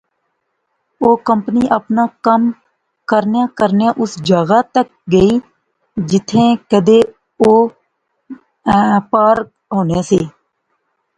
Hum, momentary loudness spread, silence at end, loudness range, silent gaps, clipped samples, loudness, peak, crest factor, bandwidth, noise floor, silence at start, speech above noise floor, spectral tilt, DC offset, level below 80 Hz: none; 8 LU; 0.9 s; 2 LU; none; under 0.1%; -14 LUFS; 0 dBFS; 14 dB; 9.4 kHz; -69 dBFS; 1 s; 56 dB; -6.5 dB/octave; under 0.1%; -46 dBFS